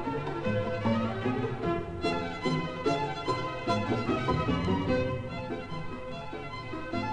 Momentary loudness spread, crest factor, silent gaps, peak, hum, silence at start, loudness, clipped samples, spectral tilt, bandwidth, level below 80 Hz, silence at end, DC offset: 10 LU; 16 dB; none; -14 dBFS; none; 0 s; -31 LUFS; under 0.1%; -7 dB/octave; 10 kHz; -48 dBFS; 0 s; 0.3%